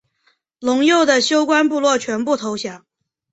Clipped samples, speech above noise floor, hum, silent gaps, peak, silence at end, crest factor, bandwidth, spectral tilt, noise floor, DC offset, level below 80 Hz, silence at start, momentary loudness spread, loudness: under 0.1%; 47 dB; none; none; -2 dBFS; 0.55 s; 16 dB; 8.2 kHz; -2.5 dB/octave; -63 dBFS; under 0.1%; -64 dBFS; 0.6 s; 12 LU; -17 LUFS